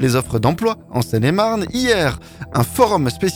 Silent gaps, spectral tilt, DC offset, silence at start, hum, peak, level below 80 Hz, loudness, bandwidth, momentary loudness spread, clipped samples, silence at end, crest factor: none; -5.5 dB/octave; under 0.1%; 0 s; none; -2 dBFS; -40 dBFS; -18 LUFS; 19 kHz; 6 LU; under 0.1%; 0 s; 16 dB